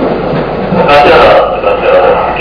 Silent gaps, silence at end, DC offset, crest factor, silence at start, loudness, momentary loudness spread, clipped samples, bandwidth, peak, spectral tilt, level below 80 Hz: none; 0 s; under 0.1%; 6 dB; 0 s; -6 LUFS; 9 LU; 5%; 5.4 kHz; 0 dBFS; -7 dB/octave; -28 dBFS